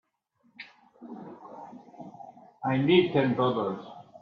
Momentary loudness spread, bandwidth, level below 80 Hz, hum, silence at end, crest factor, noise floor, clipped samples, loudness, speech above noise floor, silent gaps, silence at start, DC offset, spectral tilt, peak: 25 LU; 5.2 kHz; -70 dBFS; none; 0.2 s; 20 dB; -70 dBFS; under 0.1%; -26 LUFS; 45 dB; none; 0.6 s; under 0.1%; -8.5 dB/octave; -10 dBFS